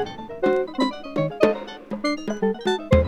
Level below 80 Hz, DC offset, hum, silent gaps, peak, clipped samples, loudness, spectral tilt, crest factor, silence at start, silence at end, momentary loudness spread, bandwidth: -36 dBFS; under 0.1%; none; none; -2 dBFS; under 0.1%; -24 LUFS; -6.5 dB/octave; 22 dB; 0 s; 0 s; 8 LU; 13 kHz